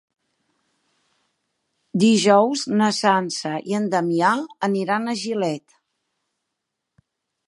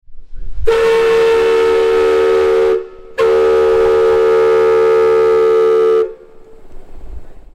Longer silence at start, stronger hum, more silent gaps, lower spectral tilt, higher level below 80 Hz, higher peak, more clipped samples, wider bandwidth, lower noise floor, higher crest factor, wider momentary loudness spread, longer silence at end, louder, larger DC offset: first, 1.95 s vs 0.1 s; neither; neither; about the same, -4.5 dB/octave vs -5 dB/octave; second, -74 dBFS vs -32 dBFS; about the same, -2 dBFS vs -2 dBFS; neither; first, 11.5 kHz vs 10 kHz; first, -80 dBFS vs -36 dBFS; first, 20 dB vs 10 dB; first, 10 LU vs 5 LU; first, 1.9 s vs 0.15 s; second, -20 LUFS vs -12 LUFS; neither